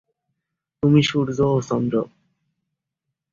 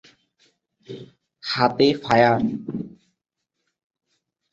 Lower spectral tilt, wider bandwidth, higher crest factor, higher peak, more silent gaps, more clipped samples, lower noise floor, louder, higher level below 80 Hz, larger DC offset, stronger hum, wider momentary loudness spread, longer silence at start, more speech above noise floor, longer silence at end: about the same, -6.5 dB/octave vs -6 dB/octave; about the same, 7.6 kHz vs 8 kHz; about the same, 20 dB vs 22 dB; about the same, -4 dBFS vs -2 dBFS; neither; neither; about the same, -82 dBFS vs -80 dBFS; about the same, -20 LUFS vs -20 LUFS; about the same, -54 dBFS vs -58 dBFS; neither; neither; second, 8 LU vs 23 LU; about the same, 0.85 s vs 0.9 s; about the same, 63 dB vs 60 dB; second, 1.25 s vs 1.65 s